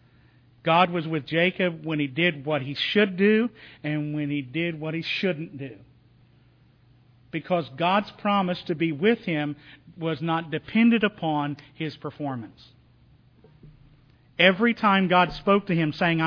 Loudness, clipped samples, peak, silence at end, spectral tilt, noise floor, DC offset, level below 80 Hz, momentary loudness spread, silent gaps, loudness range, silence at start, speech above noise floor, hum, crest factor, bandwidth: -24 LUFS; under 0.1%; -4 dBFS; 0 s; -8 dB/octave; -58 dBFS; under 0.1%; -60 dBFS; 13 LU; none; 7 LU; 0.65 s; 33 dB; none; 22 dB; 5.4 kHz